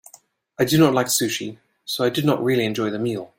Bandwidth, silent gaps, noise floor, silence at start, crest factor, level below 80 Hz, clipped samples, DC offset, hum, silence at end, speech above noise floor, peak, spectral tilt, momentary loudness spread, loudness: 16.5 kHz; none; -52 dBFS; 0.6 s; 20 dB; -58 dBFS; under 0.1%; under 0.1%; none; 0.1 s; 32 dB; -2 dBFS; -4.5 dB/octave; 12 LU; -21 LUFS